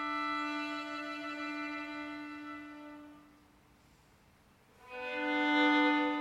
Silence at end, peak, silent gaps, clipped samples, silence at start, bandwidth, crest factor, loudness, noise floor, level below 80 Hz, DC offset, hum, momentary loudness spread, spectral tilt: 0 s; -18 dBFS; none; under 0.1%; 0 s; 10.5 kHz; 18 dB; -34 LUFS; -65 dBFS; -74 dBFS; under 0.1%; none; 21 LU; -3.5 dB/octave